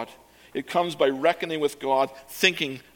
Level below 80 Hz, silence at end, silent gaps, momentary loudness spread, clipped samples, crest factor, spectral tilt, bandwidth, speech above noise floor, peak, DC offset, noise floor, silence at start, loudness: -68 dBFS; 0.15 s; none; 11 LU; under 0.1%; 22 dB; -3.5 dB/octave; 17.5 kHz; 25 dB; -4 dBFS; under 0.1%; -50 dBFS; 0 s; -24 LUFS